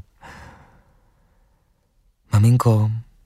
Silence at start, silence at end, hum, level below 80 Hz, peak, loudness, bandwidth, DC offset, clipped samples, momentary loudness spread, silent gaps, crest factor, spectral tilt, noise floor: 2.3 s; 0.25 s; none; -50 dBFS; -6 dBFS; -18 LUFS; 13.5 kHz; under 0.1%; under 0.1%; 26 LU; none; 16 dB; -8 dB/octave; -63 dBFS